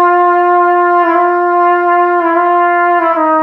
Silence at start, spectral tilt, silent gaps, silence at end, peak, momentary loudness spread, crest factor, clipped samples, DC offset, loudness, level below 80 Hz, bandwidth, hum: 0 s; -6 dB/octave; none; 0 s; 0 dBFS; 2 LU; 8 dB; under 0.1%; under 0.1%; -10 LUFS; -62 dBFS; 5.2 kHz; none